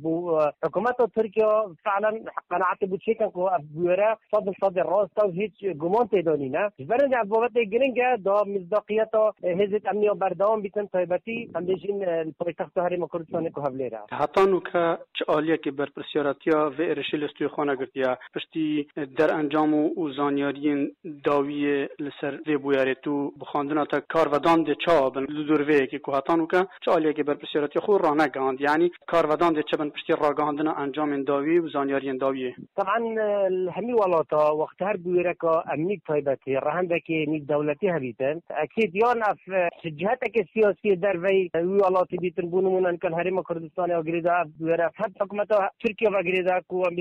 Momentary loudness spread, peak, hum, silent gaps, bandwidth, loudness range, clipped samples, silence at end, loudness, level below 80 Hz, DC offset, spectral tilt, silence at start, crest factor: 7 LU; -12 dBFS; none; none; 9 kHz; 3 LU; under 0.1%; 0 s; -25 LUFS; -66 dBFS; under 0.1%; -7.5 dB/octave; 0 s; 12 dB